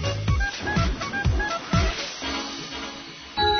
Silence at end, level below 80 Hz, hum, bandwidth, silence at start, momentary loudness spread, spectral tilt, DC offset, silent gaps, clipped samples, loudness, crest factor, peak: 0 s; -32 dBFS; none; 6.6 kHz; 0 s; 9 LU; -4.5 dB/octave; under 0.1%; none; under 0.1%; -26 LUFS; 16 dB; -10 dBFS